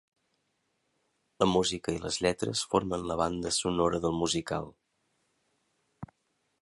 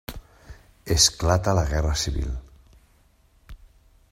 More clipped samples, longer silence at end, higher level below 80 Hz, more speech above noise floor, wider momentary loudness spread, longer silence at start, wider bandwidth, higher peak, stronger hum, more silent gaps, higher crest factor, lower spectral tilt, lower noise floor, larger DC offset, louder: neither; about the same, 0.55 s vs 0.55 s; second, -54 dBFS vs -34 dBFS; first, 48 dB vs 38 dB; second, 20 LU vs 23 LU; first, 1.4 s vs 0.1 s; second, 11.5 kHz vs 16 kHz; second, -10 dBFS vs -4 dBFS; neither; neither; about the same, 24 dB vs 22 dB; about the same, -4 dB/octave vs -3.5 dB/octave; first, -77 dBFS vs -59 dBFS; neither; second, -30 LUFS vs -22 LUFS